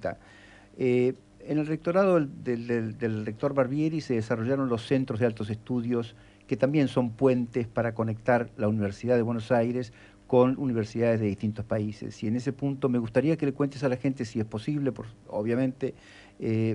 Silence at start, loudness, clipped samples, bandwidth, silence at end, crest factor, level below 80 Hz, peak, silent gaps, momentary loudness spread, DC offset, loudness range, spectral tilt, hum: 0 s; -28 LUFS; under 0.1%; 10.5 kHz; 0 s; 18 dB; -60 dBFS; -8 dBFS; none; 8 LU; under 0.1%; 2 LU; -8 dB/octave; none